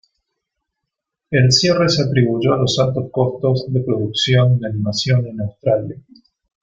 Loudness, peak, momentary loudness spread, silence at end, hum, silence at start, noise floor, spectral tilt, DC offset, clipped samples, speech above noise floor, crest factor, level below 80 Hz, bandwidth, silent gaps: -17 LUFS; -2 dBFS; 8 LU; 0.65 s; none; 1.3 s; -80 dBFS; -5.5 dB/octave; under 0.1%; under 0.1%; 64 dB; 16 dB; -50 dBFS; 7.6 kHz; none